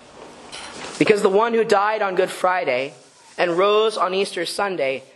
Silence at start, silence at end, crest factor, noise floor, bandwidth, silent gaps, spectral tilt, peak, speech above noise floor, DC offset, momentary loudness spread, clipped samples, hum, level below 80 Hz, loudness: 0.15 s; 0.1 s; 20 dB; -42 dBFS; 12.5 kHz; none; -4 dB/octave; 0 dBFS; 22 dB; under 0.1%; 16 LU; under 0.1%; none; -66 dBFS; -20 LUFS